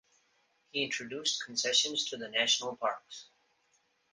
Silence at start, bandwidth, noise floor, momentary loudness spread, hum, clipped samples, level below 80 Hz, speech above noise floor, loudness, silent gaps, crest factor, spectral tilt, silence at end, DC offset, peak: 0.75 s; 10 kHz; -73 dBFS; 13 LU; none; under 0.1%; -82 dBFS; 40 dB; -31 LUFS; none; 22 dB; 0 dB/octave; 0.9 s; under 0.1%; -14 dBFS